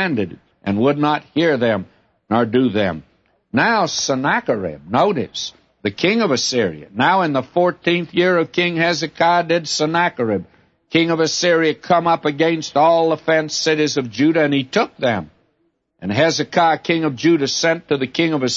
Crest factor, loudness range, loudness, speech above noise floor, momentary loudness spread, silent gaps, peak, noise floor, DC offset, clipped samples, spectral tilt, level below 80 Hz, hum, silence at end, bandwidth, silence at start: 16 dB; 3 LU; -18 LUFS; 49 dB; 7 LU; none; -2 dBFS; -66 dBFS; under 0.1%; under 0.1%; -4.5 dB/octave; -60 dBFS; none; 0 s; 8 kHz; 0 s